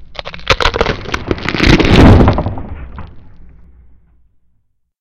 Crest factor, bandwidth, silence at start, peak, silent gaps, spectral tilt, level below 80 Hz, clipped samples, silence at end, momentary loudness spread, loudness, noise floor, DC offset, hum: 14 dB; 12 kHz; 0 s; 0 dBFS; none; -6 dB/octave; -20 dBFS; under 0.1%; 1.55 s; 23 LU; -11 LUFS; -58 dBFS; under 0.1%; none